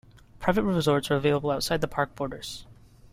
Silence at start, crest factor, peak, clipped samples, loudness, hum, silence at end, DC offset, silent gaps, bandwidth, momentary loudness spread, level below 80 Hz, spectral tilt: 0.35 s; 18 dB; -10 dBFS; under 0.1%; -26 LUFS; none; 0.4 s; under 0.1%; none; 16 kHz; 12 LU; -48 dBFS; -5.5 dB/octave